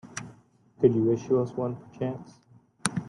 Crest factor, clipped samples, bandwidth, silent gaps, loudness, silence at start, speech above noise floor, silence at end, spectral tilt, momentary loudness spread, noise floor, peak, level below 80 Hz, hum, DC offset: 26 dB; under 0.1%; 12 kHz; none; -27 LUFS; 0.05 s; 31 dB; 0 s; -6 dB/octave; 17 LU; -57 dBFS; -4 dBFS; -64 dBFS; none; under 0.1%